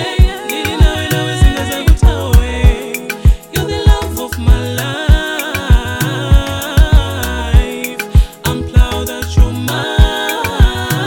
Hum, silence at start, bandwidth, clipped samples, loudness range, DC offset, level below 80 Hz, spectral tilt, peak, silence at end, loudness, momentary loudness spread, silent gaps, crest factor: none; 0 s; 18.5 kHz; 0.8%; 1 LU; 0.2%; -14 dBFS; -5 dB/octave; 0 dBFS; 0 s; -14 LUFS; 6 LU; none; 12 dB